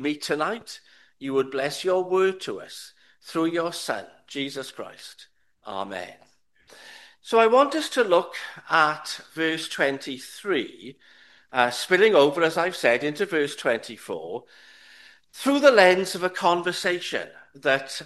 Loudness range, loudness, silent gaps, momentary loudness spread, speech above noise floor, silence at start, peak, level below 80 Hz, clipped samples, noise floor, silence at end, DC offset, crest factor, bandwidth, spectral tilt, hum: 9 LU; -23 LUFS; none; 19 LU; 28 dB; 0 s; 0 dBFS; -74 dBFS; under 0.1%; -52 dBFS; 0 s; under 0.1%; 24 dB; 12.5 kHz; -3.5 dB/octave; none